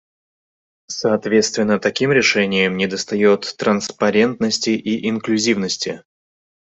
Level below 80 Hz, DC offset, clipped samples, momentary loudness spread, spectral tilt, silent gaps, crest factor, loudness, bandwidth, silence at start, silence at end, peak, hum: -60 dBFS; under 0.1%; under 0.1%; 7 LU; -4 dB/octave; none; 16 dB; -18 LUFS; 8.2 kHz; 0.9 s; 0.75 s; -2 dBFS; none